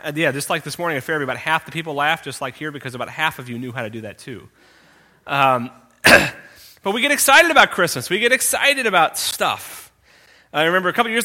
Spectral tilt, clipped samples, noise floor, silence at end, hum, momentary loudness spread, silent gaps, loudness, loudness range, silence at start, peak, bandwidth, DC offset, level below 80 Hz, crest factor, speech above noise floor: -2.5 dB/octave; under 0.1%; -52 dBFS; 0 s; none; 18 LU; none; -17 LUFS; 10 LU; 0.05 s; 0 dBFS; 17 kHz; under 0.1%; -54 dBFS; 20 dB; 33 dB